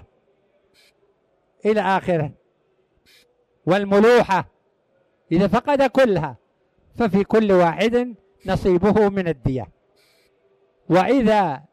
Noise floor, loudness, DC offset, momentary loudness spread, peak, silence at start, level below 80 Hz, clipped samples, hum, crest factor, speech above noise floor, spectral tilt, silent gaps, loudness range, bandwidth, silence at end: -65 dBFS; -19 LUFS; under 0.1%; 13 LU; -8 dBFS; 1.65 s; -46 dBFS; under 0.1%; none; 14 dB; 47 dB; -7 dB/octave; none; 5 LU; 13.5 kHz; 0.15 s